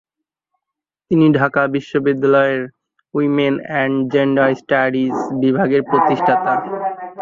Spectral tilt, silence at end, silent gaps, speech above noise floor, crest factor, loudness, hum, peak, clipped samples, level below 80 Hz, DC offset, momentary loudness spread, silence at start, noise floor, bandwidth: -8 dB/octave; 0 s; none; 68 dB; 16 dB; -16 LUFS; none; -2 dBFS; under 0.1%; -60 dBFS; under 0.1%; 7 LU; 1.1 s; -83 dBFS; 7.2 kHz